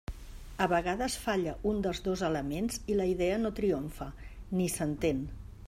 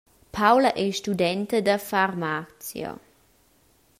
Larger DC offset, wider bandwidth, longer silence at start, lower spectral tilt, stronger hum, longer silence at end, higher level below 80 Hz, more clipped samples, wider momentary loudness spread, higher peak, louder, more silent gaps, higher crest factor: neither; about the same, 16 kHz vs 16 kHz; second, 0.1 s vs 0.35 s; about the same, -5 dB/octave vs -4.5 dB/octave; neither; second, 0 s vs 1.05 s; first, -46 dBFS vs -60 dBFS; neither; second, 14 LU vs 17 LU; second, -14 dBFS vs -6 dBFS; second, -32 LUFS vs -23 LUFS; neither; about the same, 18 dB vs 20 dB